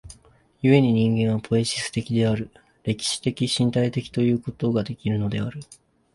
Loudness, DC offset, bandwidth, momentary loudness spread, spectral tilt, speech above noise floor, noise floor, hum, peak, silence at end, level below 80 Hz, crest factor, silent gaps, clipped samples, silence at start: -23 LUFS; under 0.1%; 11.5 kHz; 10 LU; -6 dB/octave; 34 dB; -56 dBFS; none; -4 dBFS; 0.4 s; -52 dBFS; 20 dB; none; under 0.1%; 0.05 s